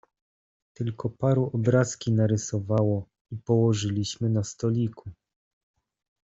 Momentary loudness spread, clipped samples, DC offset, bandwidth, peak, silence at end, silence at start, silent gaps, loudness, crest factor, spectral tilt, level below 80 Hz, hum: 11 LU; under 0.1%; under 0.1%; 8 kHz; -8 dBFS; 1.1 s; 0.8 s; 3.21-3.25 s; -26 LUFS; 18 dB; -6.5 dB/octave; -60 dBFS; none